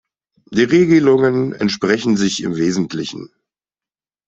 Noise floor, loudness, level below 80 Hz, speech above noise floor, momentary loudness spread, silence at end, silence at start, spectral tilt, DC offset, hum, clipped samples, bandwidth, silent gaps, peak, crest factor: under -90 dBFS; -16 LUFS; -56 dBFS; over 75 dB; 12 LU; 1 s; 0.5 s; -5.5 dB/octave; under 0.1%; none; under 0.1%; 8 kHz; none; -2 dBFS; 14 dB